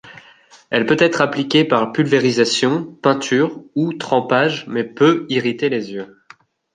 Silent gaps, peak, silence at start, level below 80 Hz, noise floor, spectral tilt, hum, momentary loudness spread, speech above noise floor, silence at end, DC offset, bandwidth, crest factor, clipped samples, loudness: none; 0 dBFS; 0.05 s; -64 dBFS; -48 dBFS; -5 dB/octave; none; 8 LU; 31 dB; 0.7 s; under 0.1%; 9.8 kHz; 18 dB; under 0.1%; -17 LUFS